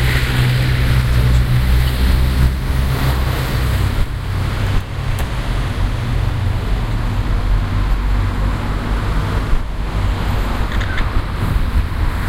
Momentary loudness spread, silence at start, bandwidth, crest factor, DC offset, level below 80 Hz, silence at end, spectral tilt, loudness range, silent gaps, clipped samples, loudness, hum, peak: 6 LU; 0 s; 16 kHz; 14 dB; under 0.1%; -18 dBFS; 0 s; -6 dB/octave; 4 LU; none; under 0.1%; -18 LUFS; none; -2 dBFS